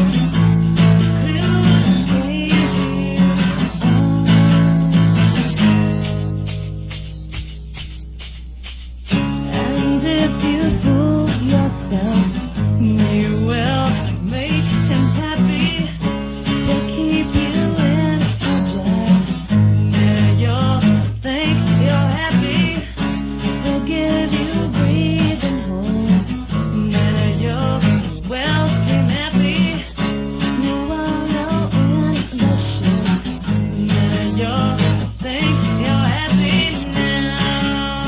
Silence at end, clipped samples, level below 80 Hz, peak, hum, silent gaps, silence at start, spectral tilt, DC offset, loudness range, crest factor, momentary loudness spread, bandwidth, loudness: 0 s; under 0.1%; -32 dBFS; -2 dBFS; none; none; 0 s; -11 dB/octave; under 0.1%; 4 LU; 14 dB; 8 LU; 4 kHz; -17 LUFS